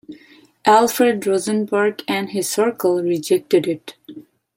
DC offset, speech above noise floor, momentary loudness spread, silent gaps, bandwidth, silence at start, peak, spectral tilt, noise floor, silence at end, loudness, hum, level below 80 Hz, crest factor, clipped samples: under 0.1%; 31 dB; 9 LU; none; 16.5 kHz; 0.1 s; -2 dBFS; -4 dB/octave; -49 dBFS; 0.35 s; -18 LUFS; none; -68 dBFS; 18 dB; under 0.1%